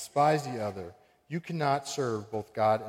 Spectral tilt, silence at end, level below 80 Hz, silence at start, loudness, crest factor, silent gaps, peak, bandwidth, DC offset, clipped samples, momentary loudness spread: -5.5 dB/octave; 0 s; -70 dBFS; 0 s; -31 LUFS; 18 dB; none; -14 dBFS; 16 kHz; under 0.1%; under 0.1%; 13 LU